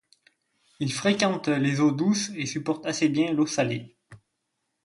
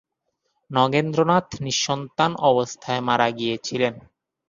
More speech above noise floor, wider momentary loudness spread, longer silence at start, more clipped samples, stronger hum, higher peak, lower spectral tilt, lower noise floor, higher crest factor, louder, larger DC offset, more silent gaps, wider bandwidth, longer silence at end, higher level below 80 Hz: about the same, 54 dB vs 54 dB; about the same, 7 LU vs 6 LU; about the same, 0.8 s vs 0.7 s; neither; neither; second, -6 dBFS vs -2 dBFS; about the same, -5 dB/octave vs -4.5 dB/octave; first, -79 dBFS vs -75 dBFS; about the same, 20 dB vs 20 dB; second, -25 LUFS vs -22 LUFS; neither; neither; first, 11.5 kHz vs 7.4 kHz; first, 0.7 s vs 0.5 s; second, -68 dBFS vs -58 dBFS